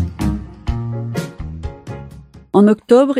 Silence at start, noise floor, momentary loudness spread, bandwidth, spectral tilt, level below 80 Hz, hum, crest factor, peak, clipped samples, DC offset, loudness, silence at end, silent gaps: 0 s; -38 dBFS; 20 LU; 14 kHz; -8 dB/octave; -30 dBFS; none; 16 dB; 0 dBFS; under 0.1%; under 0.1%; -17 LUFS; 0 s; none